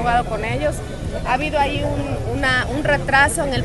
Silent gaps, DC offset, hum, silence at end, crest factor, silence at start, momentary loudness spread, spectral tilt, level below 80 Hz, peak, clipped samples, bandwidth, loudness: none; under 0.1%; none; 0 s; 18 dB; 0 s; 9 LU; -4.5 dB/octave; -30 dBFS; -2 dBFS; under 0.1%; 12.5 kHz; -19 LUFS